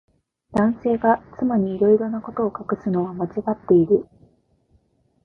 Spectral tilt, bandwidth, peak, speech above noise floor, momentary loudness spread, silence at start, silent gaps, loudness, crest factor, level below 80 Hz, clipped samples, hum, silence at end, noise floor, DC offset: -10.5 dB/octave; 4.5 kHz; -4 dBFS; 42 dB; 8 LU; 0.5 s; none; -21 LUFS; 18 dB; -54 dBFS; under 0.1%; none; 1.2 s; -62 dBFS; under 0.1%